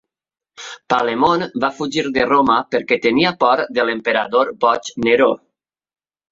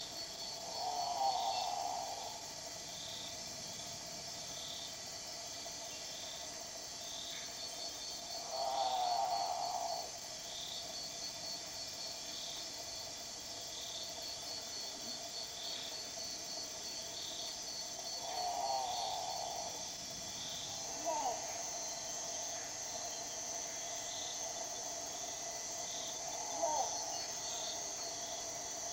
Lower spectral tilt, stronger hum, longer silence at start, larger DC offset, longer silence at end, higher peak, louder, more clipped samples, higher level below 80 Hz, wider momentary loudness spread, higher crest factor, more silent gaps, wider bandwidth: first, -4.5 dB/octave vs 0 dB/octave; neither; first, 0.6 s vs 0 s; neither; first, 0.95 s vs 0 s; first, -2 dBFS vs -22 dBFS; first, -17 LUFS vs -40 LUFS; neither; first, -56 dBFS vs -70 dBFS; about the same, 7 LU vs 7 LU; about the same, 16 dB vs 20 dB; neither; second, 7.6 kHz vs 17 kHz